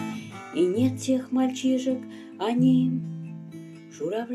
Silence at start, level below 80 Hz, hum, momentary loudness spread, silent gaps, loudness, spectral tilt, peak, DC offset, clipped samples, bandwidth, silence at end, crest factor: 0 s; -74 dBFS; none; 19 LU; none; -26 LUFS; -6.5 dB/octave; -10 dBFS; under 0.1%; under 0.1%; 12.5 kHz; 0 s; 16 dB